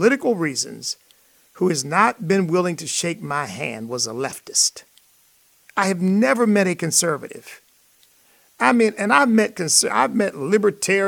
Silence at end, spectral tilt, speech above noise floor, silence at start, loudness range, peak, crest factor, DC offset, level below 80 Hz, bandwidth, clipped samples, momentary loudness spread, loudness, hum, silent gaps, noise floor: 0 s; -3.5 dB/octave; 38 dB; 0 s; 4 LU; -2 dBFS; 20 dB; under 0.1%; -70 dBFS; 18.5 kHz; under 0.1%; 11 LU; -19 LUFS; none; none; -57 dBFS